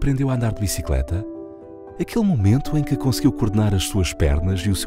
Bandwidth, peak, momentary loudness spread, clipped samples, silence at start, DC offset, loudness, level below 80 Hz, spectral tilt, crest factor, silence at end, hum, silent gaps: 16 kHz; -4 dBFS; 14 LU; under 0.1%; 0 s; under 0.1%; -21 LUFS; -30 dBFS; -6 dB/octave; 16 dB; 0 s; none; none